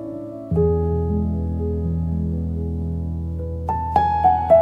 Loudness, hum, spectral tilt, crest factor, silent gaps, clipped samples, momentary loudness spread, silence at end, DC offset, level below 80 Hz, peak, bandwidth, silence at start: -22 LUFS; none; -10.5 dB/octave; 18 dB; none; under 0.1%; 10 LU; 0 s; under 0.1%; -34 dBFS; -2 dBFS; 5 kHz; 0 s